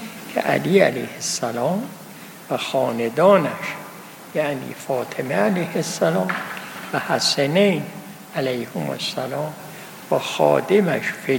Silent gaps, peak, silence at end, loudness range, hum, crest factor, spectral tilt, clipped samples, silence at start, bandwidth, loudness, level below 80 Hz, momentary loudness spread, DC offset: none; -2 dBFS; 0 s; 3 LU; none; 20 dB; -4.5 dB/octave; under 0.1%; 0 s; 17 kHz; -21 LUFS; -70 dBFS; 17 LU; under 0.1%